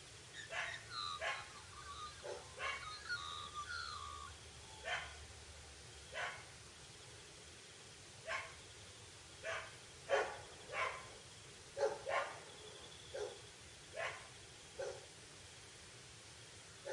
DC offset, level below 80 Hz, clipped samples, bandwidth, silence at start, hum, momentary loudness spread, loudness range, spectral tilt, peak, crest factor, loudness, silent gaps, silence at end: under 0.1%; -70 dBFS; under 0.1%; 11.5 kHz; 0 s; none; 14 LU; 7 LU; -2 dB/octave; -24 dBFS; 24 dB; -47 LUFS; none; 0 s